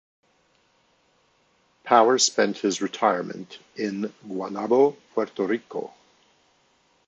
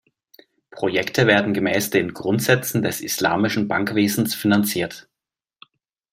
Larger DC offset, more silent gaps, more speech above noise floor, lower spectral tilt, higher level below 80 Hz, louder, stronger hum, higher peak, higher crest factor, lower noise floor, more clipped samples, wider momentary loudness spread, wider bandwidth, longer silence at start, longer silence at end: neither; neither; second, 41 dB vs 67 dB; second, -3 dB/octave vs -4.5 dB/octave; second, -76 dBFS vs -60 dBFS; second, -24 LUFS vs -20 LUFS; neither; about the same, -2 dBFS vs -2 dBFS; about the same, 24 dB vs 20 dB; second, -65 dBFS vs -87 dBFS; neither; first, 16 LU vs 6 LU; second, 9.2 kHz vs 16.5 kHz; first, 1.85 s vs 0.75 s; about the same, 1.2 s vs 1.15 s